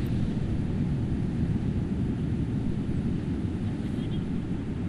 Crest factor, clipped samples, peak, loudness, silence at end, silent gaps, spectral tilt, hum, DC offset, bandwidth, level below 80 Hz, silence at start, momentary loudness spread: 12 dB; under 0.1%; -16 dBFS; -30 LUFS; 0 s; none; -9 dB/octave; none; under 0.1%; 11 kHz; -38 dBFS; 0 s; 3 LU